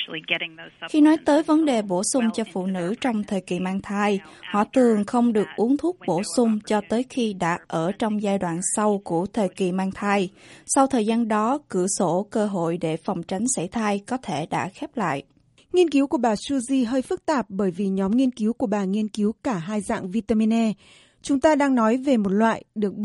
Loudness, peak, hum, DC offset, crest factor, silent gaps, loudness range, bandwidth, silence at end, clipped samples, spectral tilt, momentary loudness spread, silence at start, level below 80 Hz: -23 LUFS; -4 dBFS; none; under 0.1%; 18 dB; none; 3 LU; 11.5 kHz; 0 s; under 0.1%; -5 dB/octave; 8 LU; 0 s; -58 dBFS